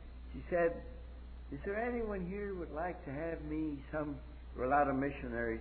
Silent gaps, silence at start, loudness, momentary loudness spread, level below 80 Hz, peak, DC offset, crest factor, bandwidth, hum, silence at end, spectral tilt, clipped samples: none; 0 s; -38 LUFS; 17 LU; -50 dBFS; -20 dBFS; under 0.1%; 18 dB; 4.5 kHz; none; 0 s; -6.5 dB/octave; under 0.1%